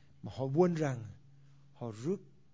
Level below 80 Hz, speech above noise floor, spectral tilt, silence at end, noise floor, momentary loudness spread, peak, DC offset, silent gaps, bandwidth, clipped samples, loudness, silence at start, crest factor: -68 dBFS; 28 dB; -8 dB/octave; 0.3 s; -61 dBFS; 17 LU; -14 dBFS; under 0.1%; none; 8 kHz; under 0.1%; -35 LUFS; 0.25 s; 22 dB